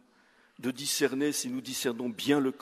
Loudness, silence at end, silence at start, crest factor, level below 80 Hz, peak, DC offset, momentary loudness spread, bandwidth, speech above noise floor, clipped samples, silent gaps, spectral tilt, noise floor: -30 LUFS; 0.05 s; 0.6 s; 20 dB; -76 dBFS; -12 dBFS; under 0.1%; 7 LU; 14.5 kHz; 34 dB; under 0.1%; none; -3 dB/octave; -64 dBFS